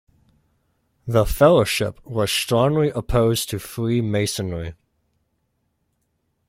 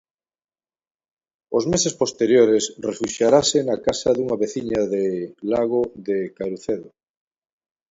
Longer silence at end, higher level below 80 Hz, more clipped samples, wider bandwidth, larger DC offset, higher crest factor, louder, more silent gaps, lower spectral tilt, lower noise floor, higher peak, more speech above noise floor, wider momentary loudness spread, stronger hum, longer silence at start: first, 1.75 s vs 1 s; first, -38 dBFS vs -56 dBFS; neither; first, 16.5 kHz vs 8 kHz; neither; about the same, 20 dB vs 20 dB; about the same, -20 LUFS vs -21 LUFS; neither; about the same, -5 dB/octave vs -4 dB/octave; second, -71 dBFS vs under -90 dBFS; about the same, -2 dBFS vs -2 dBFS; second, 51 dB vs over 70 dB; about the same, 12 LU vs 11 LU; neither; second, 1.05 s vs 1.5 s